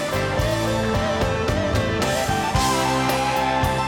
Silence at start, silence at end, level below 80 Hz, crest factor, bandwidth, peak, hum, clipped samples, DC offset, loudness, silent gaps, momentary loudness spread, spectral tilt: 0 s; 0 s; -34 dBFS; 12 dB; 18 kHz; -8 dBFS; none; under 0.1%; under 0.1%; -21 LUFS; none; 2 LU; -4.5 dB/octave